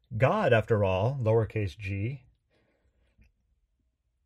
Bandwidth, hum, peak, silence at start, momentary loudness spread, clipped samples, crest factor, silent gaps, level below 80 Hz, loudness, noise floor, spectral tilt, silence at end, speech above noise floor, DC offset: 9 kHz; none; -10 dBFS; 0.1 s; 10 LU; under 0.1%; 20 dB; none; -56 dBFS; -27 LUFS; -76 dBFS; -8 dB/octave; 2.1 s; 49 dB; under 0.1%